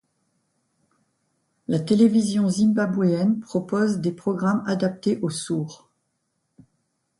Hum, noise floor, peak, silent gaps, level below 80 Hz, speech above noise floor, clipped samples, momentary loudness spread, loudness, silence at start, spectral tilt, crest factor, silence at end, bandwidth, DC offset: none; -74 dBFS; -6 dBFS; none; -66 dBFS; 53 dB; under 0.1%; 9 LU; -22 LUFS; 1.7 s; -6.5 dB/octave; 18 dB; 1.45 s; 11.5 kHz; under 0.1%